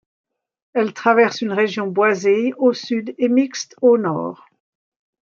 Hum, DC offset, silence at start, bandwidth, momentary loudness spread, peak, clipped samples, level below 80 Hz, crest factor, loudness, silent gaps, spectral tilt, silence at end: none; under 0.1%; 0.75 s; 7.4 kHz; 9 LU; -2 dBFS; under 0.1%; -72 dBFS; 18 dB; -18 LUFS; none; -5 dB/octave; 0.85 s